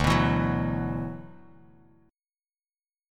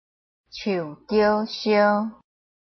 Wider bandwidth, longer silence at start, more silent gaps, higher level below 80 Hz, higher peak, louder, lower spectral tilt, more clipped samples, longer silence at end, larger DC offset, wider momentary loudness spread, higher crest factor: first, 15 kHz vs 6.4 kHz; second, 0 s vs 0.55 s; neither; first, -42 dBFS vs -60 dBFS; about the same, -8 dBFS vs -6 dBFS; second, -27 LUFS vs -22 LUFS; about the same, -6.5 dB/octave vs -6 dB/octave; neither; first, 1.75 s vs 0.55 s; neither; first, 19 LU vs 13 LU; about the same, 22 dB vs 18 dB